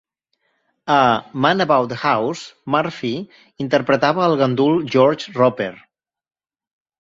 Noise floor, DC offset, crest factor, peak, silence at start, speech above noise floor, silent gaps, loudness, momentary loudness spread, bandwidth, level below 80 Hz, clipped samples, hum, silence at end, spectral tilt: under -90 dBFS; under 0.1%; 18 dB; 0 dBFS; 0.85 s; over 72 dB; none; -18 LUFS; 12 LU; 7.8 kHz; -60 dBFS; under 0.1%; none; 1.25 s; -6 dB/octave